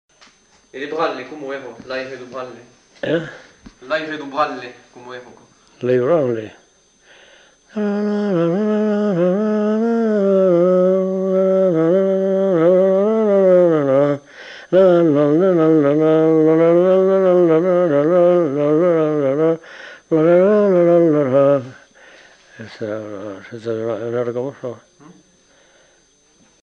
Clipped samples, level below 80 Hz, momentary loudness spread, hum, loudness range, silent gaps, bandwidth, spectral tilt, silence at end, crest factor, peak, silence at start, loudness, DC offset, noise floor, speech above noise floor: under 0.1%; -64 dBFS; 18 LU; none; 13 LU; none; 7.2 kHz; -8.5 dB/octave; 1.9 s; 14 dB; -4 dBFS; 0.75 s; -16 LUFS; under 0.1%; -55 dBFS; 36 dB